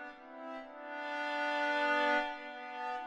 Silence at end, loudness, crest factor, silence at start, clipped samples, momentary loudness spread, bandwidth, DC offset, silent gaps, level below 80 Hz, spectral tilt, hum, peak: 0 s; -35 LUFS; 18 dB; 0 s; under 0.1%; 15 LU; 11 kHz; under 0.1%; none; -76 dBFS; -1.5 dB/octave; none; -20 dBFS